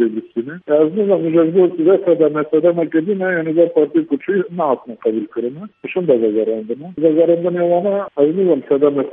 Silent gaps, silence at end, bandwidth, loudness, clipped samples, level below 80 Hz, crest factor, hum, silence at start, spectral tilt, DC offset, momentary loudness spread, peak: none; 0 s; 3.8 kHz; -16 LUFS; under 0.1%; -68 dBFS; 14 dB; none; 0 s; -11.5 dB/octave; under 0.1%; 10 LU; 0 dBFS